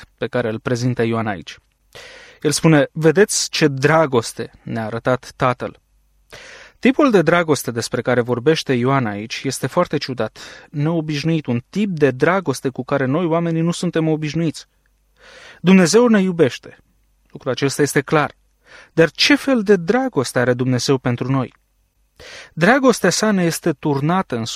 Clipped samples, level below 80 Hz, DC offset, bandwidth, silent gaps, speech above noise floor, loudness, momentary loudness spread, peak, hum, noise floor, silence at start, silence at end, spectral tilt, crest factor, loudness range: under 0.1%; -54 dBFS; under 0.1%; 15 kHz; none; 45 dB; -18 LUFS; 13 LU; -2 dBFS; none; -62 dBFS; 0 s; 0 s; -5 dB/octave; 16 dB; 3 LU